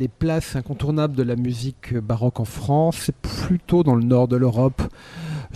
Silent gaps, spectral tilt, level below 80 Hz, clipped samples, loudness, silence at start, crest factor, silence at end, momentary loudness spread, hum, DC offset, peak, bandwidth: none; -7.5 dB/octave; -40 dBFS; under 0.1%; -22 LUFS; 0 s; 16 dB; 0 s; 11 LU; none; under 0.1%; -6 dBFS; 14.5 kHz